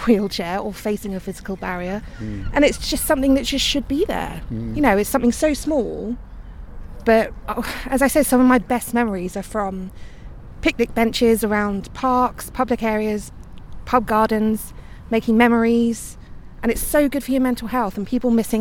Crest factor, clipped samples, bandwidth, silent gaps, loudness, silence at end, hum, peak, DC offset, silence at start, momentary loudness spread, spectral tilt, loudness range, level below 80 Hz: 18 dB; under 0.1%; 17.5 kHz; none; -20 LUFS; 0 s; none; -2 dBFS; under 0.1%; 0 s; 13 LU; -4.5 dB/octave; 2 LU; -36 dBFS